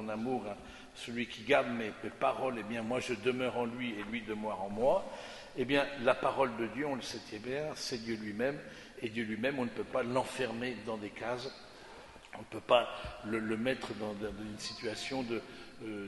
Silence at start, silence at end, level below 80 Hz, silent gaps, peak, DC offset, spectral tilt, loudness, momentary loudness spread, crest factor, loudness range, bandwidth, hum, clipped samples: 0 s; 0 s; -62 dBFS; none; -12 dBFS; under 0.1%; -4.5 dB/octave; -36 LUFS; 15 LU; 24 dB; 4 LU; 11.5 kHz; none; under 0.1%